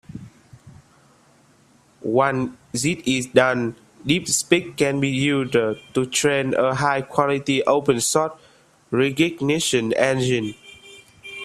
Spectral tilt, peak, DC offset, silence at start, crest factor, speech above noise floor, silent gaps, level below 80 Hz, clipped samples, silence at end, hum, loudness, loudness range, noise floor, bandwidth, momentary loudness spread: -4 dB/octave; 0 dBFS; under 0.1%; 0.1 s; 22 dB; 36 dB; none; -58 dBFS; under 0.1%; 0 s; none; -21 LUFS; 3 LU; -56 dBFS; 15 kHz; 11 LU